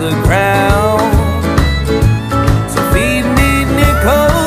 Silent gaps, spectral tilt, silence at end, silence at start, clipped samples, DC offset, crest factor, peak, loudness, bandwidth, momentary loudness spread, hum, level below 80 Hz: none; -6 dB/octave; 0 s; 0 s; under 0.1%; under 0.1%; 10 dB; 0 dBFS; -12 LUFS; 15.5 kHz; 3 LU; none; -18 dBFS